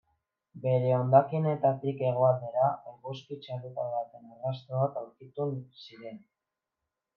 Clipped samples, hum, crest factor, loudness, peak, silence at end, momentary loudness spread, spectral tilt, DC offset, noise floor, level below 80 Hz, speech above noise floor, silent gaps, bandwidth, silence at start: under 0.1%; none; 22 dB; -29 LUFS; -8 dBFS; 1 s; 19 LU; -10 dB/octave; under 0.1%; -88 dBFS; -80 dBFS; 59 dB; none; 5.8 kHz; 0.55 s